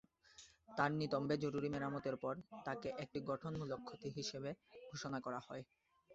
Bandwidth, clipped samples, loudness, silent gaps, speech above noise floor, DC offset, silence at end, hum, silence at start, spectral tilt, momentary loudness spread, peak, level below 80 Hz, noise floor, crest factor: 8 kHz; under 0.1%; -44 LUFS; none; 22 dB; under 0.1%; 0 s; none; 0.3 s; -5 dB/octave; 15 LU; -22 dBFS; -74 dBFS; -65 dBFS; 22 dB